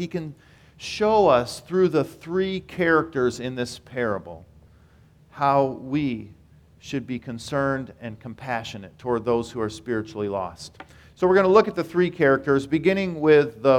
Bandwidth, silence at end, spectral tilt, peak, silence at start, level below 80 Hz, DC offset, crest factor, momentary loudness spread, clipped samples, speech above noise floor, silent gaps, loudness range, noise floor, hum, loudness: 14.5 kHz; 0 s; -6 dB/octave; -4 dBFS; 0 s; -54 dBFS; under 0.1%; 20 dB; 16 LU; under 0.1%; 31 dB; none; 7 LU; -54 dBFS; none; -23 LUFS